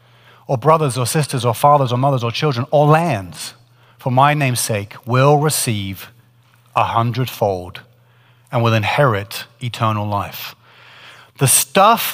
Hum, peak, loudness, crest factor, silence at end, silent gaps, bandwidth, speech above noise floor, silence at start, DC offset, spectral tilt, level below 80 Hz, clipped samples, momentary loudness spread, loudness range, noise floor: none; 0 dBFS; -16 LUFS; 18 dB; 0 s; none; 16 kHz; 36 dB; 0.5 s; under 0.1%; -4.5 dB/octave; -58 dBFS; under 0.1%; 15 LU; 4 LU; -52 dBFS